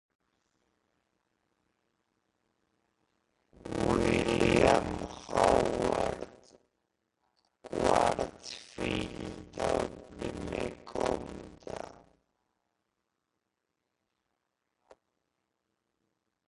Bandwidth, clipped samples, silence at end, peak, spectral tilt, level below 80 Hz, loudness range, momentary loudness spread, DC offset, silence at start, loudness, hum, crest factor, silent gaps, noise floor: 11.5 kHz; under 0.1%; 4.55 s; -10 dBFS; -5 dB/octave; -52 dBFS; 13 LU; 18 LU; under 0.1%; 3.65 s; -31 LUFS; none; 26 dB; none; -84 dBFS